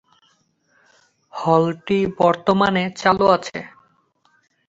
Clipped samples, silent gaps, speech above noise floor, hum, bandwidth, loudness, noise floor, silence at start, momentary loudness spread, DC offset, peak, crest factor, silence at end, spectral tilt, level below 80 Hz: under 0.1%; none; 45 dB; none; 8 kHz; -18 LUFS; -63 dBFS; 1.35 s; 16 LU; under 0.1%; -2 dBFS; 18 dB; 1 s; -6 dB/octave; -54 dBFS